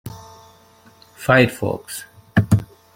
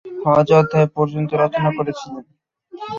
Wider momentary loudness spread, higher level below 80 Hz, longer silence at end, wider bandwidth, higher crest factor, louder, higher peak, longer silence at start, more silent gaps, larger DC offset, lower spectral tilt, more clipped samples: about the same, 19 LU vs 20 LU; first, -46 dBFS vs -56 dBFS; first, 0.3 s vs 0 s; first, 16.5 kHz vs 7.4 kHz; about the same, 20 dB vs 16 dB; about the same, -19 LUFS vs -17 LUFS; about the same, -2 dBFS vs -2 dBFS; about the same, 0.05 s vs 0.05 s; neither; neither; second, -6 dB/octave vs -8 dB/octave; neither